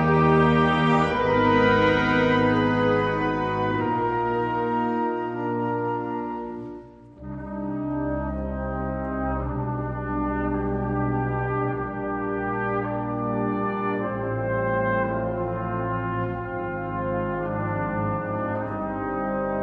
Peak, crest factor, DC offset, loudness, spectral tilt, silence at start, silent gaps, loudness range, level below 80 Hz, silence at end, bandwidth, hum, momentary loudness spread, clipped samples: -6 dBFS; 18 dB; under 0.1%; -25 LUFS; -8.5 dB/octave; 0 s; none; 8 LU; -42 dBFS; 0 s; 8 kHz; none; 10 LU; under 0.1%